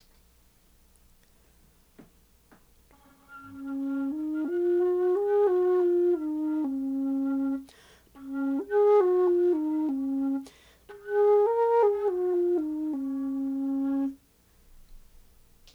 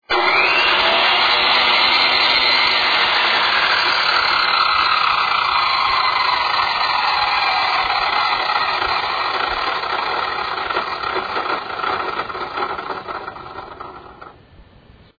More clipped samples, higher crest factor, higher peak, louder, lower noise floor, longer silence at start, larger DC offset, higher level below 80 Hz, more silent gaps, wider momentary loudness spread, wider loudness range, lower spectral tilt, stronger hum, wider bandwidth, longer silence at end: neither; about the same, 14 dB vs 16 dB; second, -14 dBFS vs -2 dBFS; second, -27 LUFS vs -16 LUFS; first, -61 dBFS vs -47 dBFS; first, 2 s vs 0.1 s; neither; second, -62 dBFS vs -50 dBFS; neither; about the same, 12 LU vs 12 LU; second, 8 LU vs 11 LU; first, -7 dB/octave vs -2.5 dB/octave; first, 60 Hz at -70 dBFS vs none; first, 5.8 kHz vs 5 kHz; first, 0.75 s vs 0.55 s